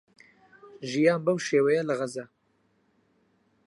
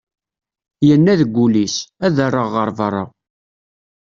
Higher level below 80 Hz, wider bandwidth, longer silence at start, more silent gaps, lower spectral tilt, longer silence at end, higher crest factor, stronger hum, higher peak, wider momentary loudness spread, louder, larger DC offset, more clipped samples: second, -80 dBFS vs -54 dBFS; first, 11.5 kHz vs 7.4 kHz; second, 0.65 s vs 0.8 s; neither; about the same, -5.5 dB/octave vs -6 dB/octave; first, 1.4 s vs 1 s; first, 20 dB vs 14 dB; neither; second, -10 dBFS vs -2 dBFS; first, 13 LU vs 9 LU; second, -26 LUFS vs -16 LUFS; neither; neither